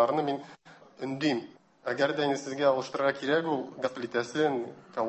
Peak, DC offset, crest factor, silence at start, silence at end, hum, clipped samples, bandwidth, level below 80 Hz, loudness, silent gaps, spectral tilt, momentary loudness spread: -12 dBFS; under 0.1%; 18 dB; 0 s; 0 s; none; under 0.1%; 8.4 kHz; -74 dBFS; -30 LUFS; none; -5 dB/octave; 11 LU